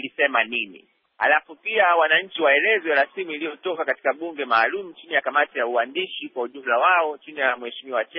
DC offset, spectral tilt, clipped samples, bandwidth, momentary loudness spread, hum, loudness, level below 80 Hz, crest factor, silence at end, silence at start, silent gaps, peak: under 0.1%; 1.5 dB/octave; under 0.1%; 4.5 kHz; 11 LU; none; -22 LUFS; -82 dBFS; 16 dB; 0 s; 0 s; none; -6 dBFS